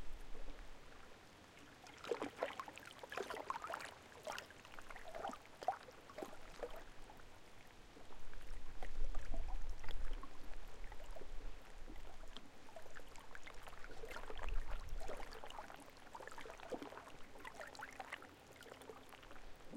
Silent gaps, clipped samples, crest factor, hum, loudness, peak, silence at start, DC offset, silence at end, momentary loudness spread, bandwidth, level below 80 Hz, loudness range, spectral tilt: none; under 0.1%; 18 dB; none; -53 LUFS; -24 dBFS; 0 s; under 0.1%; 0 s; 14 LU; 13 kHz; -50 dBFS; 7 LU; -4 dB/octave